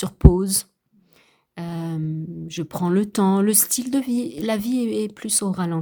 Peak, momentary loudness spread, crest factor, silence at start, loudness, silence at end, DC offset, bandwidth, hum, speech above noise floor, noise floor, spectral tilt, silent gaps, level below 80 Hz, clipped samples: 0 dBFS; 14 LU; 22 dB; 0 s; -21 LUFS; 0 s; under 0.1%; over 20 kHz; none; 38 dB; -59 dBFS; -5 dB/octave; none; -30 dBFS; under 0.1%